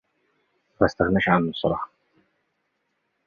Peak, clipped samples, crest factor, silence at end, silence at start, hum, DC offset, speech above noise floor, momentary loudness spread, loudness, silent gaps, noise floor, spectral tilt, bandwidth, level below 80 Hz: -2 dBFS; under 0.1%; 24 dB; 1.4 s; 0.8 s; none; under 0.1%; 53 dB; 10 LU; -23 LUFS; none; -74 dBFS; -7.5 dB/octave; 7 kHz; -48 dBFS